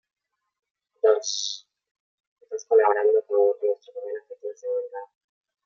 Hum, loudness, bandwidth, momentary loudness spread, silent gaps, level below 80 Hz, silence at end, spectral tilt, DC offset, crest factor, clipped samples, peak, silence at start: none; -23 LUFS; 7.4 kHz; 17 LU; 1.91-2.36 s; under -90 dBFS; 0.6 s; 1 dB/octave; under 0.1%; 20 dB; under 0.1%; -6 dBFS; 1.05 s